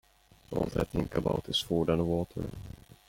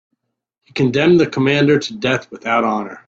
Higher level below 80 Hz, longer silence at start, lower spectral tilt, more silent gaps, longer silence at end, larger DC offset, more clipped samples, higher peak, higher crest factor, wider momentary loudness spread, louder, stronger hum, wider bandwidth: first, -48 dBFS vs -54 dBFS; second, 0.5 s vs 0.75 s; about the same, -6 dB/octave vs -6 dB/octave; neither; first, 0.35 s vs 0.15 s; neither; neither; second, -14 dBFS vs -2 dBFS; about the same, 18 dB vs 16 dB; first, 12 LU vs 8 LU; second, -32 LUFS vs -16 LUFS; neither; first, 16.5 kHz vs 7.8 kHz